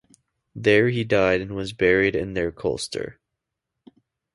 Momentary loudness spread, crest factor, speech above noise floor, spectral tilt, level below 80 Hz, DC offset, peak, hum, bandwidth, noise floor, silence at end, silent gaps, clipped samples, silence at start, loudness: 12 LU; 20 dB; 61 dB; -5.5 dB/octave; -48 dBFS; under 0.1%; -4 dBFS; none; 11.5 kHz; -83 dBFS; 1.25 s; none; under 0.1%; 0.55 s; -22 LUFS